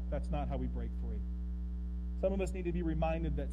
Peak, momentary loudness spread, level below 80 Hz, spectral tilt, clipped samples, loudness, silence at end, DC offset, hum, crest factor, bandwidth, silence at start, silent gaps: -22 dBFS; 7 LU; -38 dBFS; -8.5 dB/octave; under 0.1%; -38 LUFS; 0 s; under 0.1%; none; 14 dB; 10.5 kHz; 0 s; none